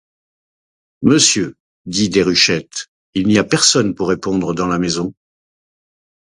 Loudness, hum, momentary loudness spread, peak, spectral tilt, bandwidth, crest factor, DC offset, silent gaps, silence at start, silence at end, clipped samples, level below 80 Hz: -15 LUFS; none; 13 LU; 0 dBFS; -3.5 dB/octave; 11.5 kHz; 18 dB; under 0.1%; 1.60-1.85 s, 2.88-3.13 s; 1 s; 1.2 s; under 0.1%; -48 dBFS